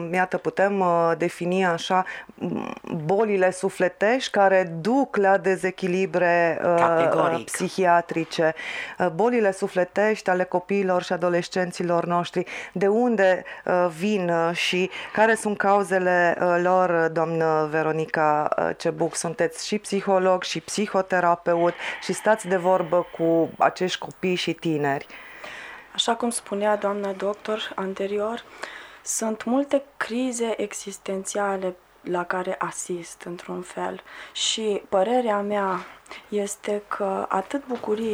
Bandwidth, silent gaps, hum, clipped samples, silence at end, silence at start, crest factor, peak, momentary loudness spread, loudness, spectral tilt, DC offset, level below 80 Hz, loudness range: over 20 kHz; none; none; under 0.1%; 0 s; 0 s; 18 dB; -4 dBFS; 11 LU; -23 LUFS; -4.5 dB/octave; under 0.1%; -66 dBFS; 6 LU